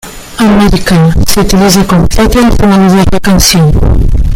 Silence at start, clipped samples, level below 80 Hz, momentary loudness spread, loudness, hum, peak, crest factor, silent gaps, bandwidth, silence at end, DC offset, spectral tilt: 0.05 s; 1%; -12 dBFS; 4 LU; -6 LUFS; none; 0 dBFS; 6 dB; none; 19 kHz; 0 s; under 0.1%; -5 dB/octave